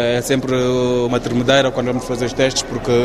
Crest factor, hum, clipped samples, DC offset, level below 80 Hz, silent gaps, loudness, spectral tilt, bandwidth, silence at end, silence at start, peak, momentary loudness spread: 16 dB; none; under 0.1%; under 0.1%; -38 dBFS; none; -17 LUFS; -4.5 dB/octave; 14 kHz; 0 s; 0 s; 0 dBFS; 6 LU